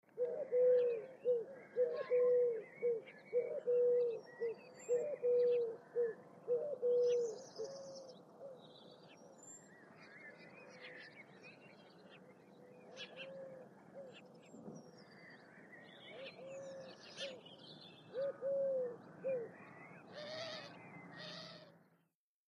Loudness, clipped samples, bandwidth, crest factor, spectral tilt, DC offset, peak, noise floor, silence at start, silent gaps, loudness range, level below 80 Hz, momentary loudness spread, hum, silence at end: -39 LUFS; under 0.1%; 7.8 kHz; 16 dB; -4 dB/octave; under 0.1%; -26 dBFS; -83 dBFS; 0.15 s; none; 19 LU; under -90 dBFS; 24 LU; none; 0.8 s